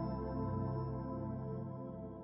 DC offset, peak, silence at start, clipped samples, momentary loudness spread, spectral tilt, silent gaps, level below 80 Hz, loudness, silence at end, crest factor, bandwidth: under 0.1%; -28 dBFS; 0 s; under 0.1%; 7 LU; -10 dB/octave; none; -54 dBFS; -42 LUFS; 0 s; 14 dB; 5.6 kHz